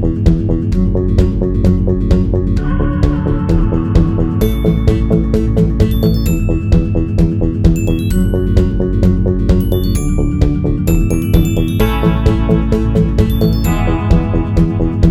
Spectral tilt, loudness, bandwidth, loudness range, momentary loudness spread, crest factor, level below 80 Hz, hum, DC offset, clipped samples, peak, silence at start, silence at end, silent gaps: -8 dB/octave; -14 LUFS; 16.5 kHz; 1 LU; 2 LU; 12 dB; -16 dBFS; none; under 0.1%; under 0.1%; 0 dBFS; 0 s; 0 s; none